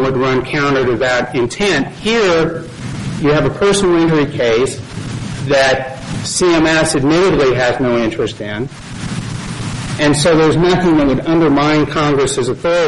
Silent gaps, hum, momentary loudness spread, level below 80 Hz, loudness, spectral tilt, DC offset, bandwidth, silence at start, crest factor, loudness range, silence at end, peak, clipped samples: none; none; 12 LU; -36 dBFS; -14 LUFS; -5 dB/octave; 0.4%; 11.5 kHz; 0 s; 10 dB; 2 LU; 0 s; -4 dBFS; under 0.1%